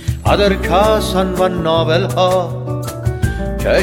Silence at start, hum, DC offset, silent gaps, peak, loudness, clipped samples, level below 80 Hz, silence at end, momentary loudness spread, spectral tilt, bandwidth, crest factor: 0 s; none; under 0.1%; none; 0 dBFS; -15 LUFS; under 0.1%; -26 dBFS; 0 s; 8 LU; -6 dB/octave; 17 kHz; 14 dB